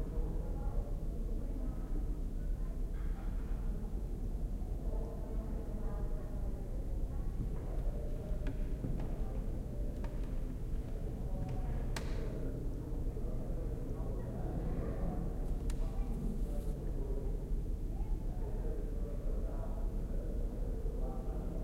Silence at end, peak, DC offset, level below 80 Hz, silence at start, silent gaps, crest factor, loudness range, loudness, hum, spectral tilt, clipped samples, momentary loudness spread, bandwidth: 0 s; -24 dBFS; under 0.1%; -38 dBFS; 0 s; none; 12 dB; 2 LU; -42 LUFS; none; -8 dB/octave; under 0.1%; 2 LU; 10.5 kHz